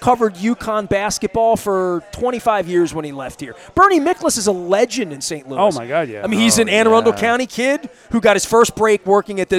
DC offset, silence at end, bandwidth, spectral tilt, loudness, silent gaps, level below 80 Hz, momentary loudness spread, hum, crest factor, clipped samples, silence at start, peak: under 0.1%; 0 s; 16 kHz; -3.5 dB/octave; -16 LUFS; none; -46 dBFS; 10 LU; none; 16 dB; under 0.1%; 0 s; 0 dBFS